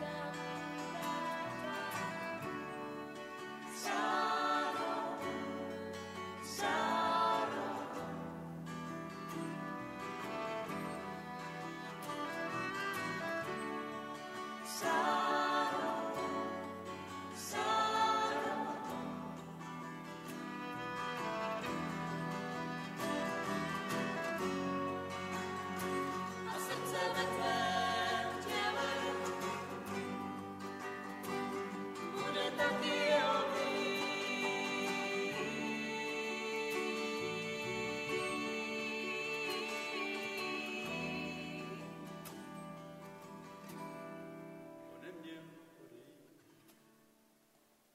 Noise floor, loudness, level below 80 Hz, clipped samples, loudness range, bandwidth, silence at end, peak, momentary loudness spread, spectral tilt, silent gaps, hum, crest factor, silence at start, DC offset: -71 dBFS; -39 LUFS; -74 dBFS; under 0.1%; 7 LU; 16 kHz; 1.2 s; -18 dBFS; 13 LU; -4 dB/octave; none; none; 20 dB; 0 s; under 0.1%